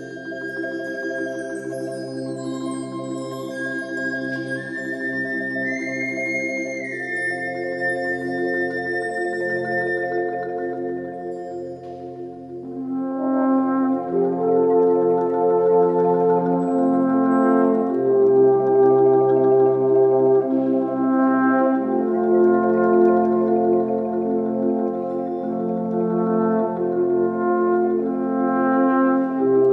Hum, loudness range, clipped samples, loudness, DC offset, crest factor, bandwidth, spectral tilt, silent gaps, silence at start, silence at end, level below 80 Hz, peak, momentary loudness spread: none; 10 LU; under 0.1%; -20 LUFS; under 0.1%; 14 dB; 11 kHz; -7.5 dB/octave; none; 0 s; 0 s; -70 dBFS; -6 dBFS; 13 LU